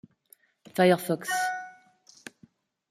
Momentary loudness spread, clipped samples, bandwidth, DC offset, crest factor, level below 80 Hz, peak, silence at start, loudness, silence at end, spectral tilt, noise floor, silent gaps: 25 LU; under 0.1%; 16 kHz; under 0.1%; 20 dB; -76 dBFS; -10 dBFS; 0.75 s; -26 LUFS; 1.2 s; -5 dB/octave; -62 dBFS; none